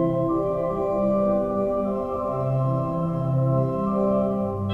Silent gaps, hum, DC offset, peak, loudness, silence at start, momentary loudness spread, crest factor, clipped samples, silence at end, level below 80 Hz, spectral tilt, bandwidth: none; none; under 0.1%; -12 dBFS; -24 LUFS; 0 s; 4 LU; 12 dB; under 0.1%; 0 s; -46 dBFS; -11 dB/octave; 4.2 kHz